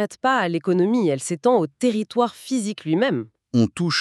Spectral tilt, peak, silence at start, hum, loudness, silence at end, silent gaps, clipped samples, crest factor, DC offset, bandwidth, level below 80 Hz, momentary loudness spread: -5.5 dB/octave; -6 dBFS; 0 s; none; -22 LUFS; 0 s; none; under 0.1%; 16 dB; under 0.1%; 12.5 kHz; -68 dBFS; 5 LU